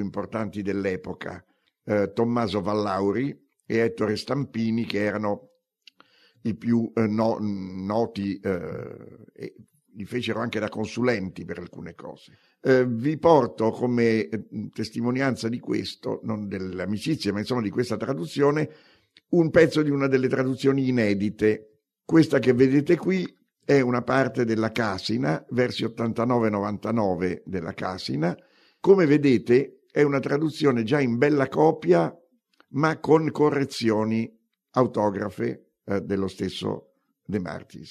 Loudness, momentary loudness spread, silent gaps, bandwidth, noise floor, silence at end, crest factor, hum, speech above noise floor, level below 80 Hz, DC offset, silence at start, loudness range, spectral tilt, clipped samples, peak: -24 LUFS; 13 LU; none; 13 kHz; -63 dBFS; 0 s; 20 dB; none; 39 dB; -64 dBFS; under 0.1%; 0 s; 6 LU; -7 dB/octave; under 0.1%; -4 dBFS